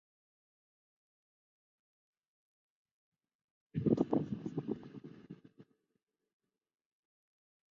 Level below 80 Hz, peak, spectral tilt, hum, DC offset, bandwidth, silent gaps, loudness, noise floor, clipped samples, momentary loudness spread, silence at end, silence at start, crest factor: -72 dBFS; -16 dBFS; -10 dB/octave; none; under 0.1%; 7 kHz; none; -37 LUFS; -86 dBFS; under 0.1%; 22 LU; 2.1 s; 3.75 s; 28 dB